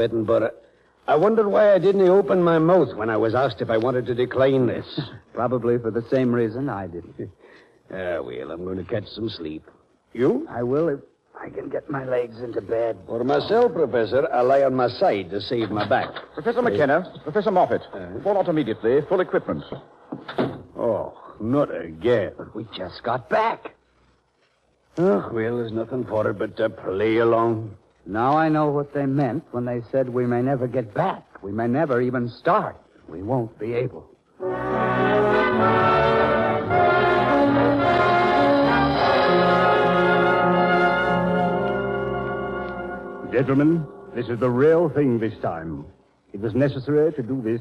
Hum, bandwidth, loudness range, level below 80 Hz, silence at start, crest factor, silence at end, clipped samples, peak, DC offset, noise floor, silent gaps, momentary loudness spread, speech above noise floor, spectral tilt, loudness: none; 9.2 kHz; 8 LU; -52 dBFS; 0 s; 14 dB; 0 s; under 0.1%; -8 dBFS; under 0.1%; -65 dBFS; none; 14 LU; 43 dB; -8 dB/octave; -22 LUFS